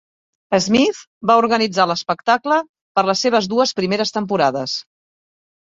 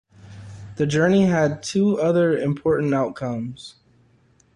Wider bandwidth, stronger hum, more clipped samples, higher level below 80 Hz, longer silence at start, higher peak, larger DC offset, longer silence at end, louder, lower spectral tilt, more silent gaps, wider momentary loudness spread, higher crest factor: second, 7.8 kHz vs 11 kHz; neither; neither; about the same, -58 dBFS vs -54 dBFS; first, 0.5 s vs 0.25 s; first, -2 dBFS vs -8 dBFS; neither; about the same, 0.85 s vs 0.85 s; first, -18 LUFS vs -21 LUFS; second, -4 dB/octave vs -6.5 dB/octave; first, 1.07-1.21 s, 2.69-2.74 s, 2.81-2.95 s vs none; second, 7 LU vs 22 LU; about the same, 18 dB vs 14 dB